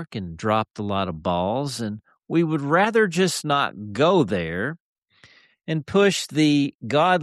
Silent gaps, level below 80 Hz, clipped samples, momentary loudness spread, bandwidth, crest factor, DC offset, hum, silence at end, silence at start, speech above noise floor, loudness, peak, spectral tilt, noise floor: 4.80-5.02 s, 6.75-6.80 s; -56 dBFS; under 0.1%; 11 LU; 13 kHz; 16 dB; under 0.1%; none; 0 s; 0 s; 33 dB; -22 LUFS; -6 dBFS; -5 dB/octave; -55 dBFS